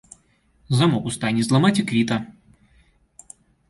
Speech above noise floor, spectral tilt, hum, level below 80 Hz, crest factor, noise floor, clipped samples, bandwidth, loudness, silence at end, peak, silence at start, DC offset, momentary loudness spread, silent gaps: 41 dB; -5.5 dB/octave; none; -56 dBFS; 18 dB; -61 dBFS; under 0.1%; 11.5 kHz; -21 LUFS; 1.4 s; -6 dBFS; 0.7 s; under 0.1%; 7 LU; none